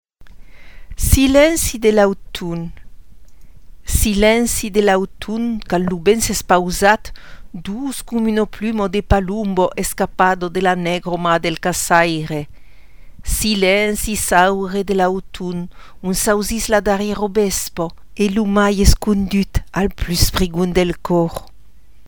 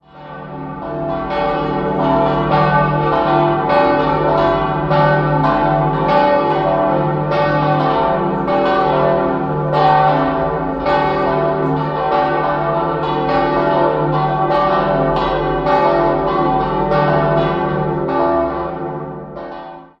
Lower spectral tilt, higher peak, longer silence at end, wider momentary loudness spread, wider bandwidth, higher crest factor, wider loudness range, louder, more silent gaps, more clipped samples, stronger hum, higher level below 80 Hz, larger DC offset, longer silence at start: second, -4.5 dB/octave vs -9 dB/octave; about the same, 0 dBFS vs -2 dBFS; first, 0.65 s vs 0.15 s; first, 12 LU vs 9 LU; first, over 20 kHz vs 6.2 kHz; about the same, 18 dB vs 14 dB; about the same, 2 LU vs 2 LU; about the same, -17 LUFS vs -15 LUFS; neither; neither; neither; first, -28 dBFS vs -36 dBFS; first, 2% vs under 0.1%; about the same, 0.05 s vs 0.15 s